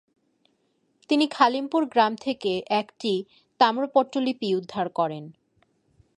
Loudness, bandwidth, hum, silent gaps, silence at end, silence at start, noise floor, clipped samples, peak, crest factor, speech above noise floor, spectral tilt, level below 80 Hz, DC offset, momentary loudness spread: -24 LUFS; 11 kHz; none; none; 0.85 s; 1.1 s; -70 dBFS; under 0.1%; -4 dBFS; 22 dB; 46 dB; -5.5 dB/octave; -72 dBFS; under 0.1%; 8 LU